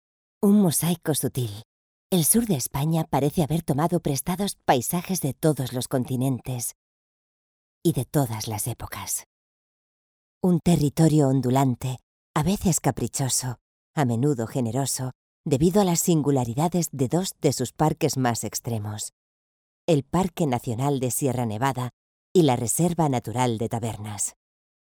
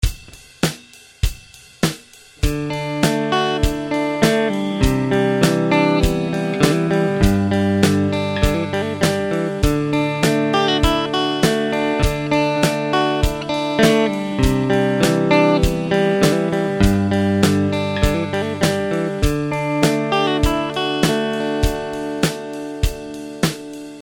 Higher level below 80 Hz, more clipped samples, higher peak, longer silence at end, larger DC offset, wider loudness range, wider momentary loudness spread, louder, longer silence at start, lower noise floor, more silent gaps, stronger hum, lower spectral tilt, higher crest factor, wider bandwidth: second, -50 dBFS vs -28 dBFS; neither; second, -4 dBFS vs 0 dBFS; first, 0.55 s vs 0 s; neither; about the same, 5 LU vs 4 LU; first, 10 LU vs 7 LU; second, -24 LUFS vs -18 LUFS; first, 0.4 s vs 0 s; first, under -90 dBFS vs -43 dBFS; first, 1.65-2.10 s, 6.75-7.81 s, 9.26-10.41 s, 12.03-12.34 s, 13.61-13.94 s, 15.15-15.44 s, 19.13-19.88 s, 21.93-22.35 s vs none; neither; about the same, -5.5 dB/octave vs -5.5 dB/octave; about the same, 20 dB vs 18 dB; first, over 20 kHz vs 17.5 kHz